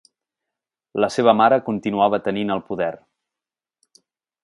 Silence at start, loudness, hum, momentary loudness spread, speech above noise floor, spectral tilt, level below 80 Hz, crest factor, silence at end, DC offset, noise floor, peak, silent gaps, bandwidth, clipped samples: 0.95 s; -20 LUFS; none; 10 LU; 70 dB; -6 dB/octave; -62 dBFS; 22 dB; 1.5 s; under 0.1%; -89 dBFS; 0 dBFS; none; 11.5 kHz; under 0.1%